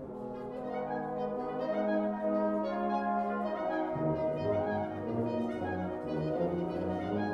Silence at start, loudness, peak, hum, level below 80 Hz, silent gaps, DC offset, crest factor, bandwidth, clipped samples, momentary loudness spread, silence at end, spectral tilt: 0 s; -34 LUFS; -20 dBFS; none; -60 dBFS; none; under 0.1%; 14 dB; 7.2 kHz; under 0.1%; 5 LU; 0 s; -9 dB/octave